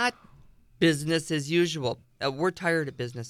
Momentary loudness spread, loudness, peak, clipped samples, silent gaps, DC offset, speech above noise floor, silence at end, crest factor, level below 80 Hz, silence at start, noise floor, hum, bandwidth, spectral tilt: 7 LU; -27 LUFS; -10 dBFS; under 0.1%; none; under 0.1%; 28 dB; 0 s; 18 dB; -62 dBFS; 0 s; -55 dBFS; none; 14.5 kHz; -5 dB/octave